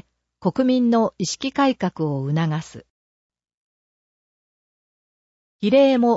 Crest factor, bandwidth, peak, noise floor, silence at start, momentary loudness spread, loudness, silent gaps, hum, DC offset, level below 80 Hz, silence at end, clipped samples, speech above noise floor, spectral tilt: 16 dB; 8 kHz; -6 dBFS; under -90 dBFS; 0.4 s; 10 LU; -21 LUFS; 2.90-3.30 s, 3.54-5.59 s; none; under 0.1%; -62 dBFS; 0 s; under 0.1%; over 71 dB; -6 dB/octave